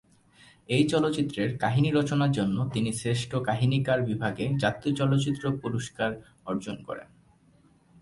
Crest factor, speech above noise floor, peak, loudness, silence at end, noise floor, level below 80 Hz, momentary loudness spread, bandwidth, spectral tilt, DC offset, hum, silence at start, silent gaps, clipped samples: 18 dB; 34 dB; -10 dBFS; -27 LUFS; 1 s; -61 dBFS; -58 dBFS; 9 LU; 11.5 kHz; -6.5 dB/octave; under 0.1%; none; 0.7 s; none; under 0.1%